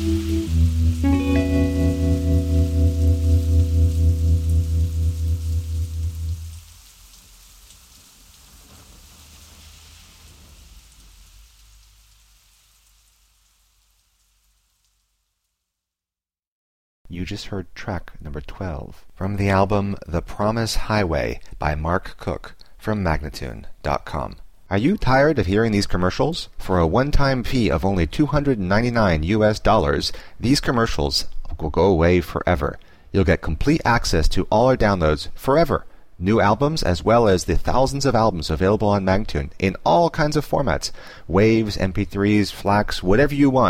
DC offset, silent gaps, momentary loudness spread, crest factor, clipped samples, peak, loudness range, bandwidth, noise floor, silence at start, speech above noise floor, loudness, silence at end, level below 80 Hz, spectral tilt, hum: under 0.1%; 16.47-17.05 s; 13 LU; 16 dB; under 0.1%; -4 dBFS; 11 LU; 15.5 kHz; under -90 dBFS; 0 s; over 71 dB; -20 LUFS; 0 s; -28 dBFS; -6.5 dB/octave; none